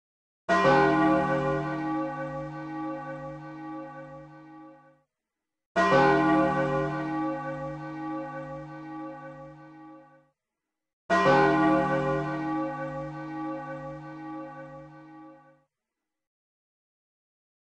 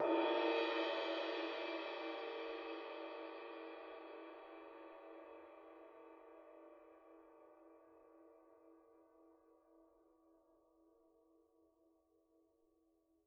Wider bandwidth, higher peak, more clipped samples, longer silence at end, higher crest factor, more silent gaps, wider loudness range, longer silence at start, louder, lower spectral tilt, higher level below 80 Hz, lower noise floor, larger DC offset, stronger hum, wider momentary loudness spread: first, 9.2 kHz vs 7 kHz; first, -10 dBFS vs -26 dBFS; neither; second, 2.25 s vs 3.45 s; about the same, 20 dB vs 22 dB; first, 5.66-5.75 s, 10.93-11.09 s vs none; second, 14 LU vs 25 LU; first, 0.5 s vs 0 s; first, -26 LUFS vs -43 LUFS; first, -7 dB/octave vs 1 dB/octave; first, -58 dBFS vs under -90 dBFS; first, -87 dBFS vs -78 dBFS; neither; neither; second, 23 LU vs 27 LU